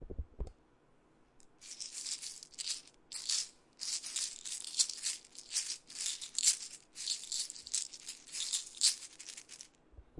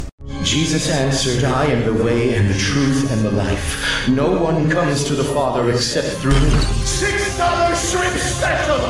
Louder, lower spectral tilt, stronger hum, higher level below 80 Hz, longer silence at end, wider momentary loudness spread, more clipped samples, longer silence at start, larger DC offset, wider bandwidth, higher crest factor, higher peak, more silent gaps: second, -36 LUFS vs -17 LUFS; second, 1 dB/octave vs -4.5 dB/octave; neither; second, -58 dBFS vs -26 dBFS; about the same, 0 s vs 0 s; first, 18 LU vs 2 LU; neither; about the same, 0 s vs 0 s; neither; second, 11.5 kHz vs 15 kHz; first, 30 dB vs 12 dB; second, -12 dBFS vs -4 dBFS; second, none vs 0.12-0.18 s